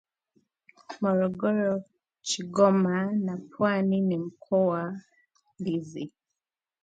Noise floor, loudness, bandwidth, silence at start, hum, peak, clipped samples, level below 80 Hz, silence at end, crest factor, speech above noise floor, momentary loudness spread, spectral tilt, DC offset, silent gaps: -89 dBFS; -27 LUFS; 9.2 kHz; 0.9 s; none; -8 dBFS; under 0.1%; -72 dBFS; 0.75 s; 20 dB; 63 dB; 16 LU; -6 dB/octave; under 0.1%; none